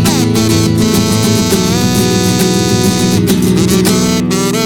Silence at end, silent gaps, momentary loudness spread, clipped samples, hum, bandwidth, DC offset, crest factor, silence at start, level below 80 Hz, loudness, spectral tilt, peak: 0 s; none; 1 LU; under 0.1%; none; 19.5 kHz; 0.7%; 10 dB; 0 s; -32 dBFS; -11 LUFS; -5 dB/octave; 0 dBFS